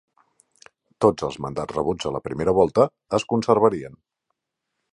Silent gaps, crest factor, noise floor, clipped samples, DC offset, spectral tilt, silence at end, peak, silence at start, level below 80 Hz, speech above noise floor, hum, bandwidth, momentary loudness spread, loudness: none; 22 dB; -81 dBFS; under 0.1%; under 0.1%; -6.5 dB/octave; 1.05 s; -2 dBFS; 1 s; -52 dBFS; 59 dB; none; 10.5 kHz; 10 LU; -22 LUFS